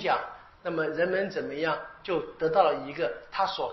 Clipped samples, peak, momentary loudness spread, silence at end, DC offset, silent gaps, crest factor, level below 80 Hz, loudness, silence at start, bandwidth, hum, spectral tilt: under 0.1%; -8 dBFS; 9 LU; 0 s; under 0.1%; none; 20 dB; -62 dBFS; -29 LUFS; 0 s; 6 kHz; none; -2.5 dB/octave